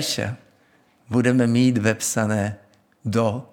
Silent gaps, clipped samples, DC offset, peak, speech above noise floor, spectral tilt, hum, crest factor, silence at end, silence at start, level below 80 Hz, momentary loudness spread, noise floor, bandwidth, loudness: none; under 0.1%; under 0.1%; -4 dBFS; 38 dB; -5 dB/octave; none; 18 dB; 0.1 s; 0 s; -66 dBFS; 14 LU; -59 dBFS; 17.5 kHz; -21 LUFS